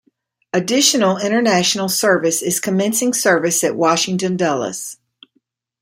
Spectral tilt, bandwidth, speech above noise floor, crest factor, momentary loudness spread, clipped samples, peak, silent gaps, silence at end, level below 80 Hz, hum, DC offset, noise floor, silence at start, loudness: -3 dB/octave; 16.5 kHz; 49 dB; 18 dB; 8 LU; under 0.1%; 0 dBFS; none; 0.9 s; -64 dBFS; none; under 0.1%; -66 dBFS; 0.55 s; -16 LUFS